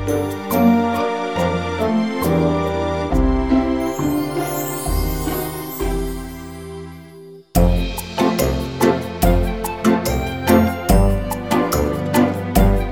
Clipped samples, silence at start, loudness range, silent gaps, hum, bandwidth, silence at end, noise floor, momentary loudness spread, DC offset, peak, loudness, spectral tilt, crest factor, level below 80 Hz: under 0.1%; 0 s; 6 LU; none; none; over 20 kHz; 0 s; -40 dBFS; 9 LU; 0.4%; 0 dBFS; -19 LUFS; -6 dB/octave; 18 dB; -26 dBFS